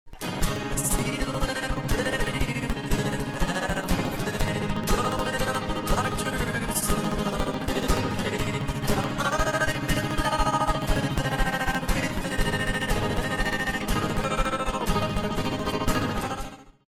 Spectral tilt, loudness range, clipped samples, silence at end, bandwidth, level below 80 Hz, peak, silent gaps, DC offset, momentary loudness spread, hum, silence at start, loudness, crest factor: -4.5 dB/octave; 2 LU; under 0.1%; 0.25 s; 18.5 kHz; -32 dBFS; -10 dBFS; none; under 0.1%; 3 LU; none; 0.05 s; -27 LUFS; 14 dB